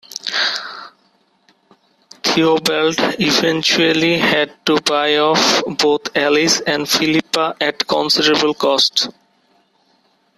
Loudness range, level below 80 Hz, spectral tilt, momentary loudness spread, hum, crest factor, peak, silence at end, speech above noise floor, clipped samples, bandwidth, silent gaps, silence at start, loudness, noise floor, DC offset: 3 LU; -58 dBFS; -2.5 dB/octave; 6 LU; none; 16 dB; -2 dBFS; 1.3 s; 43 dB; under 0.1%; 14.5 kHz; none; 0.15 s; -15 LUFS; -59 dBFS; under 0.1%